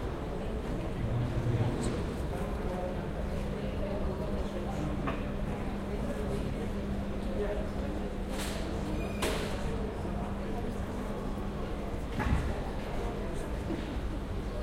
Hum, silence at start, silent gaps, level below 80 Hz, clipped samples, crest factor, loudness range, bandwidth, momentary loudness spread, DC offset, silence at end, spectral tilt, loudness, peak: none; 0 s; none; -38 dBFS; under 0.1%; 16 dB; 2 LU; 16 kHz; 5 LU; under 0.1%; 0 s; -6.5 dB/octave; -35 LUFS; -16 dBFS